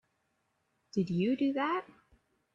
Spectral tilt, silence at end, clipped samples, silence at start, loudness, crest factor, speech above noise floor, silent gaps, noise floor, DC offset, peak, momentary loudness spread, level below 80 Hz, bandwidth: -7.5 dB/octave; 0.7 s; under 0.1%; 0.95 s; -32 LUFS; 16 dB; 47 dB; none; -78 dBFS; under 0.1%; -20 dBFS; 7 LU; -72 dBFS; 7.4 kHz